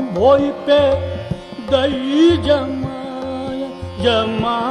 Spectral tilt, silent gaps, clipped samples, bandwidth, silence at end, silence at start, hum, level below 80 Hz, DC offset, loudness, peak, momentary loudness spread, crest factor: -6.5 dB/octave; none; under 0.1%; 10.5 kHz; 0 s; 0 s; none; -38 dBFS; under 0.1%; -17 LUFS; -2 dBFS; 13 LU; 16 dB